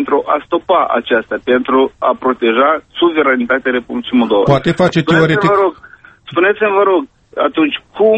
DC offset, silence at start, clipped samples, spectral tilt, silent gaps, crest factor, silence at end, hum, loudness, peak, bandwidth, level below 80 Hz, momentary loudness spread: under 0.1%; 0 s; under 0.1%; -7 dB/octave; none; 14 dB; 0 s; none; -13 LUFS; 0 dBFS; 8.4 kHz; -48 dBFS; 5 LU